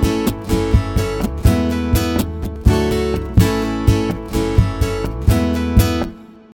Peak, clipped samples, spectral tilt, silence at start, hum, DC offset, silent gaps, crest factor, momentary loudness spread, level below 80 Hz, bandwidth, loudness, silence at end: 0 dBFS; under 0.1%; -6.5 dB/octave; 0 s; none; under 0.1%; none; 16 dB; 5 LU; -22 dBFS; 18 kHz; -18 LUFS; 0.2 s